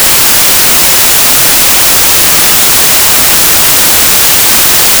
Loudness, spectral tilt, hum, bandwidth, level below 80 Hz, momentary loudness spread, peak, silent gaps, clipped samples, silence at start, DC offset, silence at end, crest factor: -2 LUFS; 0 dB/octave; none; over 20 kHz; -30 dBFS; 0 LU; 0 dBFS; none; under 0.1%; 0 s; under 0.1%; 0 s; 4 dB